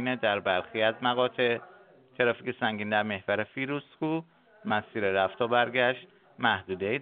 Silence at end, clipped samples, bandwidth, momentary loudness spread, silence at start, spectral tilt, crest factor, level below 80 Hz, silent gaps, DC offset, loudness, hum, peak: 0 s; under 0.1%; 4.7 kHz; 7 LU; 0 s; -2.5 dB/octave; 20 dB; -74 dBFS; none; under 0.1%; -29 LUFS; none; -10 dBFS